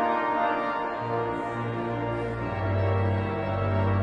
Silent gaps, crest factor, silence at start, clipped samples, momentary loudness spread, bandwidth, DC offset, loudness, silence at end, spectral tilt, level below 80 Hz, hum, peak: none; 14 dB; 0 s; under 0.1%; 5 LU; 5.8 kHz; under 0.1%; -28 LUFS; 0 s; -8.5 dB/octave; -48 dBFS; none; -14 dBFS